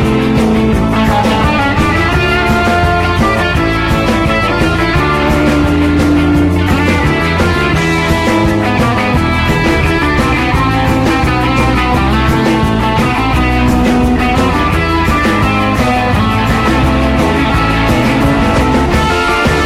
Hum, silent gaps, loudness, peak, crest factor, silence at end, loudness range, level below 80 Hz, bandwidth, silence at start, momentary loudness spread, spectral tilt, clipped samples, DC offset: none; none; -11 LUFS; 0 dBFS; 10 dB; 0 s; 0 LU; -20 dBFS; 16 kHz; 0 s; 1 LU; -6 dB/octave; under 0.1%; under 0.1%